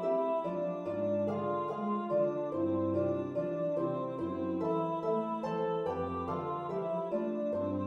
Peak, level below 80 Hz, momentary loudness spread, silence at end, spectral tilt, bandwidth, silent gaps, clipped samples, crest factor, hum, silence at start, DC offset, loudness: -20 dBFS; -68 dBFS; 4 LU; 0 s; -9 dB/octave; 6.6 kHz; none; under 0.1%; 14 dB; none; 0 s; under 0.1%; -34 LUFS